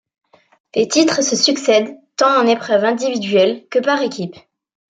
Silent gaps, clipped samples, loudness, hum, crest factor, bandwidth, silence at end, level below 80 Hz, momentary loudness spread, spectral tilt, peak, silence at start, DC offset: none; under 0.1%; -16 LUFS; none; 16 dB; 9.6 kHz; 0.6 s; -66 dBFS; 9 LU; -3 dB/octave; 0 dBFS; 0.75 s; under 0.1%